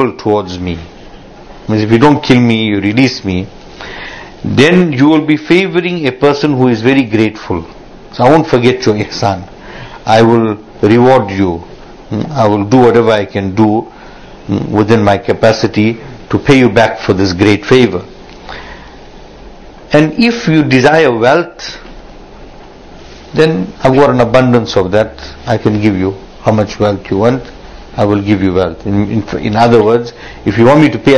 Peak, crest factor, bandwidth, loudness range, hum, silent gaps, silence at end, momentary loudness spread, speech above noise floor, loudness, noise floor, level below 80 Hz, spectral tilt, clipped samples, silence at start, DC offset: 0 dBFS; 10 dB; 11 kHz; 3 LU; none; none; 0 s; 17 LU; 23 dB; -10 LUFS; -33 dBFS; -36 dBFS; -6.5 dB/octave; 2%; 0 s; under 0.1%